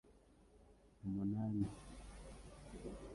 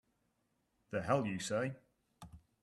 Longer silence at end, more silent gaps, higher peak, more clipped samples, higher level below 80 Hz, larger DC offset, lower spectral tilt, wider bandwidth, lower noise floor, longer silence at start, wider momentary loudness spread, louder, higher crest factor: second, 0 s vs 0.25 s; neither; second, -28 dBFS vs -18 dBFS; neither; first, -60 dBFS vs -70 dBFS; neither; first, -8 dB/octave vs -5.5 dB/octave; second, 11.5 kHz vs 13 kHz; second, -67 dBFS vs -81 dBFS; second, 0.05 s vs 0.9 s; second, 16 LU vs 23 LU; second, -45 LUFS vs -38 LUFS; about the same, 18 dB vs 22 dB